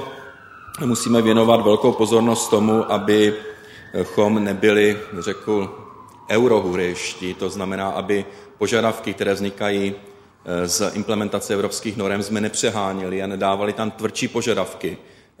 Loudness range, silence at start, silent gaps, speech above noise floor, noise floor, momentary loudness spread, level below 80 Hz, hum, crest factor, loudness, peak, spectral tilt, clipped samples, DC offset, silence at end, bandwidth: 6 LU; 0 s; none; 21 dB; -41 dBFS; 14 LU; -58 dBFS; none; 20 dB; -20 LUFS; 0 dBFS; -4.5 dB/octave; under 0.1%; under 0.1%; 0.4 s; 16 kHz